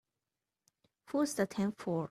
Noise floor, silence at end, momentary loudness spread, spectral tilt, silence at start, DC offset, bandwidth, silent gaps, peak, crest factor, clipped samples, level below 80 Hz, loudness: under -90 dBFS; 0.05 s; 4 LU; -5.5 dB/octave; 1.1 s; under 0.1%; 14.5 kHz; none; -20 dBFS; 18 dB; under 0.1%; -74 dBFS; -35 LUFS